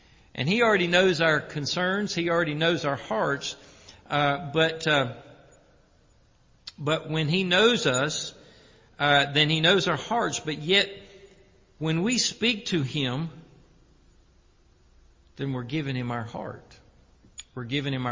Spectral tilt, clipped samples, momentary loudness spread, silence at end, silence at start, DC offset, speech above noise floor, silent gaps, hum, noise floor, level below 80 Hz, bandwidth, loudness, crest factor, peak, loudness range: -4 dB/octave; under 0.1%; 17 LU; 0 s; 0.35 s; under 0.1%; 35 dB; none; none; -60 dBFS; -58 dBFS; 7.6 kHz; -25 LUFS; 20 dB; -6 dBFS; 12 LU